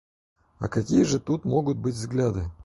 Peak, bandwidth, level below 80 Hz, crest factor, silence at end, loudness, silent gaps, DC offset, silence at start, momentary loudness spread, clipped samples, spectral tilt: -8 dBFS; 11.5 kHz; -44 dBFS; 18 dB; 0 s; -25 LUFS; none; under 0.1%; 0.6 s; 7 LU; under 0.1%; -6.5 dB/octave